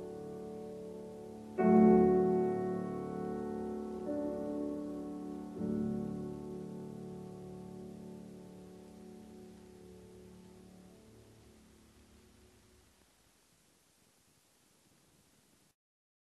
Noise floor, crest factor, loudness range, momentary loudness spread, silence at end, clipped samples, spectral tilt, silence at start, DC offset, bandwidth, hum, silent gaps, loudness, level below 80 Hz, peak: -70 dBFS; 24 dB; 24 LU; 27 LU; 5.15 s; under 0.1%; -9 dB/octave; 0 s; under 0.1%; 12.5 kHz; none; none; -35 LUFS; -64 dBFS; -14 dBFS